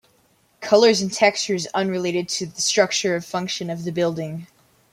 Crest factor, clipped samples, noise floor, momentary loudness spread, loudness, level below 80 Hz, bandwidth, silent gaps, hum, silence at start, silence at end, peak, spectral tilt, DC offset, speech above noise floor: 20 dB; under 0.1%; -61 dBFS; 11 LU; -21 LUFS; -66 dBFS; 16 kHz; none; none; 0.6 s; 0.45 s; -2 dBFS; -3.5 dB/octave; under 0.1%; 40 dB